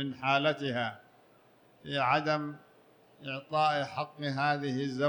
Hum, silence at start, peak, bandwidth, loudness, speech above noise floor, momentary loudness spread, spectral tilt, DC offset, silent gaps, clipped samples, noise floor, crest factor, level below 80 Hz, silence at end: none; 0 s; -12 dBFS; 19.5 kHz; -31 LUFS; 31 dB; 13 LU; -6 dB/octave; under 0.1%; none; under 0.1%; -62 dBFS; 20 dB; -74 dBFS; 0 s